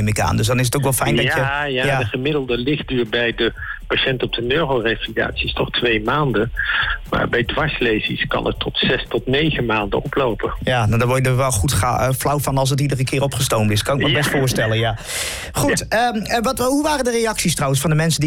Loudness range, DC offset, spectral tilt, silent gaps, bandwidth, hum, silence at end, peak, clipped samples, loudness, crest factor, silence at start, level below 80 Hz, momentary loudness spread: 2 LU; under 0.1%; -4.5 dB/octave; none; 17 kHz; none; 0 s; -8 dBFS; under 0.1%; -18 LUFS; 10 dB; 0 s; -36 dBFS; 4 LU